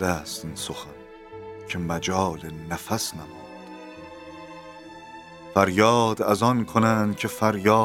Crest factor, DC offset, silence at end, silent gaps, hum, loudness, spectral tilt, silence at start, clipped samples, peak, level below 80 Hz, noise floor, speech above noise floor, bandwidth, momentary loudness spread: 24 dB; under 0.1%; 0 s; none; none; -24 LUFS; -5 dB/octave; 0 s; under 0.1%; -2 dBFS; -54 dBFS; -43 dBFS; 20 dB; 18 kHz; 22 LU